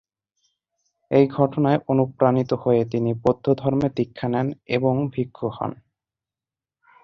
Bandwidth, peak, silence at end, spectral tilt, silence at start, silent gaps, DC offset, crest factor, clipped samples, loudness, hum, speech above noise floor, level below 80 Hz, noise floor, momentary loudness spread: 6.6 kHz; -4 dBFS; 1.3 s; -9.5 dB/octave; 1.1 s; none; under 0.1%; 20 dB; under 0.1%; -22 LUFS; none; over 69 dB; -56 dBFS; under -90 dBFS; 8 LU